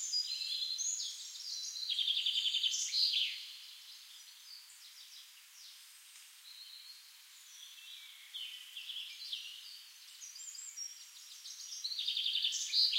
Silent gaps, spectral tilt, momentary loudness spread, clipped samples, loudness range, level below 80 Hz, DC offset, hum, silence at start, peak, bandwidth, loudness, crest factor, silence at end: none; 11 dB/octave; 21 LU; under 0.1%; 18 LU; under -90 dBFS; under 0.1%; none; 0 s; -18 dBFS; 16 kHz; -36 LUFS; 22 dB; 0 s